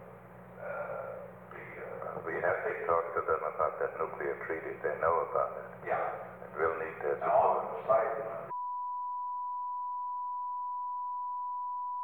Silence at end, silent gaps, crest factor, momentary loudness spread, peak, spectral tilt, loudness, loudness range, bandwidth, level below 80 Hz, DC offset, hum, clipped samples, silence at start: 0 s; none; 20 dB; 14 LU; -14 dBFS; -8 dB/octave; -34 LUFS; 5 LU; 18.5 kHz; -68 dBFS; under 0.1%; none; under 0.1%; 0 s